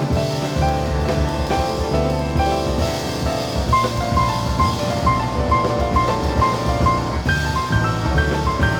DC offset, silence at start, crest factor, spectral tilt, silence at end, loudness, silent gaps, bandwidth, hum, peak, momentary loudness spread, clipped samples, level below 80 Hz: under 0.1%; 0 s; 14 dB; -5.5 dB/octave; 0 s; -19 LUFS; none; 20 kHz; none; -4 dBFS; 3 LU; under 0.1%; -26 dBFS